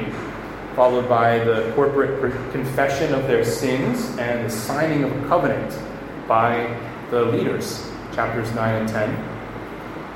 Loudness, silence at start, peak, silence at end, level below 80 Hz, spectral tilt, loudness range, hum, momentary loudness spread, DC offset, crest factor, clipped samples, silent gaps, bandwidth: -21 LUFS; 0 s; -4 dBFS; 0 s; -46 dBFS; -6 dB/octave; 3 LU; none; 13 LU; under 0.1%; 18 dB; under 0.1%; none; 16.5 kHz